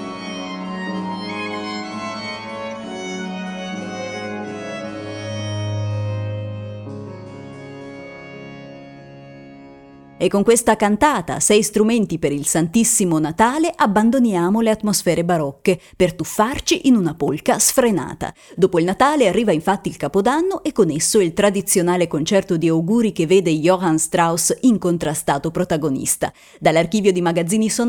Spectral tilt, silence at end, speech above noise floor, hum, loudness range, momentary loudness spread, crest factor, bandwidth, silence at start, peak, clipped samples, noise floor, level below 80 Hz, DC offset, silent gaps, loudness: -4.5 dB/octave; 0 s; 26 dB; none; 11 LU; 14 LU; 16 dB; 19 kHz; 0 s; -2 dBFS; under 0.1%; -43 dBFS; -48 dBFS; under 0.1%; none; -18 LUFS